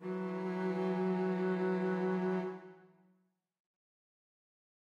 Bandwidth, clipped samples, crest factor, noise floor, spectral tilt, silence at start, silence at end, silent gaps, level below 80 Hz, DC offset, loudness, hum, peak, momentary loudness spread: 6.8 kHz; under 0.1%; 12 dB; -76 dBFS; -9 dB/octave; 0 s; 2 s; none; under -90 dBFS; under 0.1%; -35 LUFS; none; -24 dBFS; 5 LU